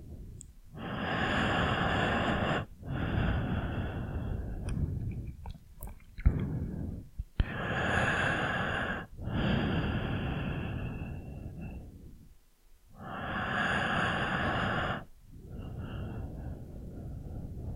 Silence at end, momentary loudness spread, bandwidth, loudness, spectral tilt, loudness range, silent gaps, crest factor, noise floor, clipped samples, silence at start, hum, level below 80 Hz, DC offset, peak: 0 s; 18 LU; 16 kHz; -33 LUFS; -6.5 dB/octave; 6 LU; none; 22 dB; -59 dBFS; under 0.1%; 0 s; none; -42 dBFS; under 0.1%; -12 dBFS